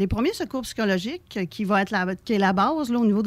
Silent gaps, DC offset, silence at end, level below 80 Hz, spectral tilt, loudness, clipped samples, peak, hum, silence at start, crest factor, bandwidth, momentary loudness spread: none; under 0.1%; 0 s; -46 dBFS; -6 dB/octave; -24 LUFS; under 0.1%; -8 dBFS; none; 0 s; 14 dB; 15 kHz; 9 LU